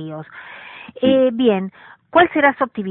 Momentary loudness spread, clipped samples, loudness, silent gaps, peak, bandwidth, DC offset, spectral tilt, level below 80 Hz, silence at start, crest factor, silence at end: 21 LU; under 0.1%; -16 LUFS; none; 0 dBFS; 4.1 kHz; under 0.1%; -10.5 dB/octave; -58 dBFS; 0 s; 18 dB; 0 s